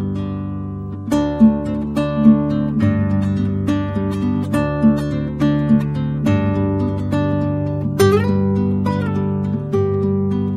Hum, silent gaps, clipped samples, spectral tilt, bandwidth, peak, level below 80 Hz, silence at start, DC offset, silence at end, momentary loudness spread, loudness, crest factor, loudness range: none; none; under 0.1%; -8.5 dB/octave; 13.5 kHz; 0 dBFS; -38 dBFS; 0 s; under 0.1%; 0 s; 7 LU; -18 LUFS; 16 dB; 1 LU